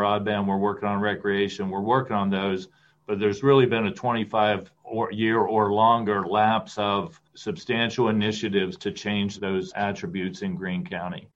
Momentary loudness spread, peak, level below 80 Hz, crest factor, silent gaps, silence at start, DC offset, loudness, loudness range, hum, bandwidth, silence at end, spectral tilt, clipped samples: 11 LU; -6 dBFS; -64 dBFS; 18 dB; none; 0 s; under 0.1%; -25 LUFS; 4 LU; none; 8 kHz; 0.1 s; -6 dB/octave; under 0.1%